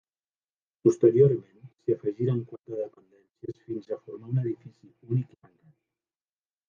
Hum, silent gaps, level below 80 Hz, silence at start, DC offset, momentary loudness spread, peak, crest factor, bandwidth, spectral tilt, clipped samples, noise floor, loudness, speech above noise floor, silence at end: none; none; -72 dBFS; 0.85 s; under 0.1%; 18 LU; -8 dBFS; 22 dB; 7.4 kHz; -10 dB/octave; under 0.1%; under -90 dBFS; -27 LUFS; over 63 dB; 1.45 s